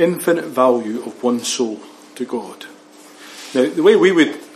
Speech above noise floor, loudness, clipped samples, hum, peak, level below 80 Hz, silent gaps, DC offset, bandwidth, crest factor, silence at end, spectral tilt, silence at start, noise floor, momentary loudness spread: 26 dB; -17 LUFS; under 0.1%; none; 0 dBFS; -74 dBFS; none; under 0.1%; 14.5 kHz; 18 dB; 0.1 s; -4 dB/octave; 0 s; -43 dBFS; 22 LU